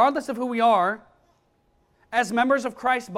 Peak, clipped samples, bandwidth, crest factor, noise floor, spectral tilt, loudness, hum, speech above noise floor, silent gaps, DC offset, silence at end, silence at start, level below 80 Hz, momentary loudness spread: -6 dBFS; under 0.1%; 14 kHz; 18 dB; -65 dBFS; -4 dB/octave; -23 LUFS; none; 43 dB; none; under 0.1%; 0 s; 0 s; -66 dBFS; 8 LU